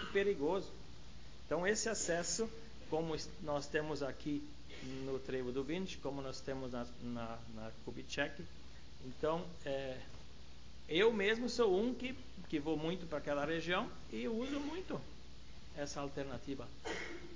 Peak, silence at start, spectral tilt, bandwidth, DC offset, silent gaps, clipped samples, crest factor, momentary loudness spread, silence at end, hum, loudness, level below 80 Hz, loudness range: -20 dBFS; 0 s; -4 dB/octave; 7.8 kHz; 0.4%; none; under 0.1%; 20 dB; 20 LU; 0 s; none; -40 LUFS; -58 dBFS; 7 LU